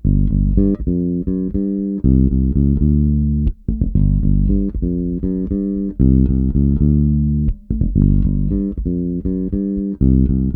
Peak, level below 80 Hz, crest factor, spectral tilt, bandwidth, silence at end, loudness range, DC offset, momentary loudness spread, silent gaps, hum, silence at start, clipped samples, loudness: 0 dBFS; -20 dBFS; 14 dB; -15 dB/octave; 1.4 kHz; 0 s; 2 LU; under 0.1%; 6 LU; none; none; 0.05 s; under 0.1%; -17 LUFS